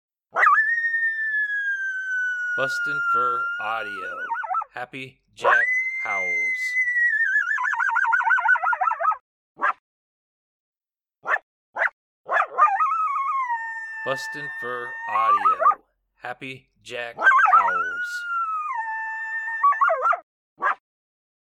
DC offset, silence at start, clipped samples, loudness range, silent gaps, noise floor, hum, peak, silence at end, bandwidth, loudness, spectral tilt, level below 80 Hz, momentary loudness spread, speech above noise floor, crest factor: under 0.1%; 0.35 s; under 0.1%; 5 LU; 9.21-9.55 s, 9.79-10.73 s, 11.43-11.74 s, 11.93-12.24 s, 20.23-20.56 s; -85 dBFS; none; -6 dBFS; 0.75 s; 14 kHz; -22 LUFS; -2.5 dB/octave; -74 dBFS; 14 LU; 62 dB; 18 dB